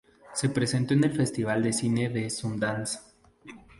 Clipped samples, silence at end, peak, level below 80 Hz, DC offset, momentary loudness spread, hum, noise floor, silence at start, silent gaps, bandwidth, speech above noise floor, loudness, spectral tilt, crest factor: under 0.1%; 0.2 s; -12 dBFS; -60 dBFS; under 0.1%; 8 LU; none; -50 dBFS; 0.25 s; none; 11.5 kHz; 23 dB; -28 LUFS; -5 dB/octave; 16 dB